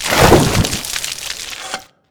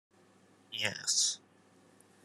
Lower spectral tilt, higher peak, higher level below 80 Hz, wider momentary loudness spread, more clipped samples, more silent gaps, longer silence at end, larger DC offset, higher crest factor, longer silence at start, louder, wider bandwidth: first, -4 dB/octave vs 0.5 dB/octave; first, 0 dBFS vs -14 dBFS; first, -28 dBFS vs -88 dBFS; about the same, 16 LU vs 15 LU; first, 0.2% vs under 0.1%; neither; second, 0.25 s vs 0.85 s; neither; second, 16 dB vs 24 dB; second, 0 s vs 0.7 s; first, -15 LUFS vs -32 LUFS; first, over 20 kHz vs 13.5 kHz